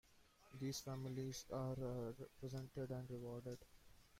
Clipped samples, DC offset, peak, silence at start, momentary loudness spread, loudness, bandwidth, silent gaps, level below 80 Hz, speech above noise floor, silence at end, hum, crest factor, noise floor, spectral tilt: under 0.1%; under 0.1%; -36 dBFS; 0.1 s; 8 LU; -49 LUFS; 16 kHz; none; -70 dBFS; 22 dB; 0 s; none; 14 dB; -71 dBFS; -6 dB/octave